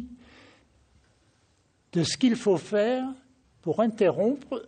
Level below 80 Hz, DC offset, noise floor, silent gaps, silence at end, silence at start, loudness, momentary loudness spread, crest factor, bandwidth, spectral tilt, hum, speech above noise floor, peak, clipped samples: -64 dBFS; under 0.1%; -66 dBFS; none; 0.05 s; 0 s; -26 LUFS; 13 LU; 18 dB; 9.4 kHz; -5.5 dB/octave; none; 42 dB; -10 dBFS; under 0.1%